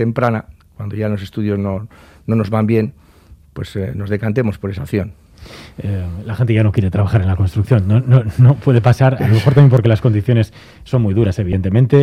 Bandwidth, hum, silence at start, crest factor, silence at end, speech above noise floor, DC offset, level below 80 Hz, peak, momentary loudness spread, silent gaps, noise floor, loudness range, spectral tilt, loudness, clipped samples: 9.6 kHz; none; 0 s; 14 dB; 0 s; 30 dB; under 0.1%; -42 dBFS; 0 dBFS; 14 LU; none; -44 dBFS; 9 LU; -9 dB/octave; -15 LUFS; under 0.1%